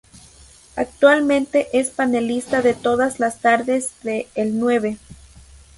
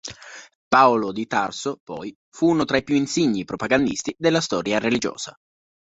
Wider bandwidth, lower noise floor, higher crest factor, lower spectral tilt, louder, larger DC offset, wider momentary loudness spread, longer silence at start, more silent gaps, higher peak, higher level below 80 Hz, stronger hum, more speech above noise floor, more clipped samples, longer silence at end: first, 11.5 kHz vs 8.2 kHz; first, -47 dBFS vs -40 dBFS; about the same, 18 dB vs 20 dB; about the same, -4 dB/octave vs -4.5 dB/octave; about the same, -19 LUFS vs -21 LUFS; neither; second, 11 LU vs 17 LU; first, 0.75 s vs 0.05 s; second, none vs 0.55-0.71 s, 1.80-1.87 s, 2.15-2.32 s; about the same, -2 dBFS vs -2 dBFS; about the same, -52 dBFS vs -56 dBFS; neither; first, 29 dB vs 19 dB; neither; about the same, 0.65 s vs 0.55 s